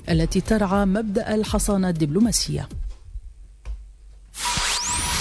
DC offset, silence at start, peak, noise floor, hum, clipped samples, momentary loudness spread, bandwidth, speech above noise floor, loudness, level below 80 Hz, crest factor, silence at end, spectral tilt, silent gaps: under 0.1%; 0 s; -8 dBFS; -45 dBFS; none; under 0.1%; 19 LU; 11 kHz; 24 dB; -22 LUFS; -34 dBFS; 16 dB; 0 s; -4 dB/octave; none